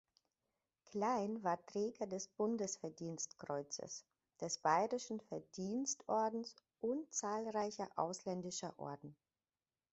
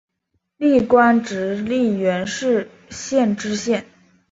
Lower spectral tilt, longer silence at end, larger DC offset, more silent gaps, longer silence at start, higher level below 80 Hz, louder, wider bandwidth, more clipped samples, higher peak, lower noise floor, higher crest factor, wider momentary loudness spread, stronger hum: about the same, -4.5 dB/octave vs -5 dB/octave; first, 0.8 s vs 0.5 s; neither; neither; first, 0.9 s vs 0.6 s; second, -84 dBFS vs -54 dBFS; second, -42 LUFS vs -19 LUFS; about the same, 8 kHz vs 8 kHz; neither; second, -22 dBFS vs -2 dBFS; first, under -90 dBFS vs -72 dBFS; about the same, 22 dB vs 18 dB; about the same, 11 LU vs 10 LU; neither